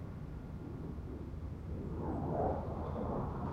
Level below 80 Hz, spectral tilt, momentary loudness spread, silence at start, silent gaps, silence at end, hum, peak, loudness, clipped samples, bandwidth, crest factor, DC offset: -48 dBFS; -10 dB/octave; 10 LU; 0 s; none; 0 s; none; -24 dBFS; -41 LUFS; under 0.1%; 7.8 kHz; 16 dB; under 0.1%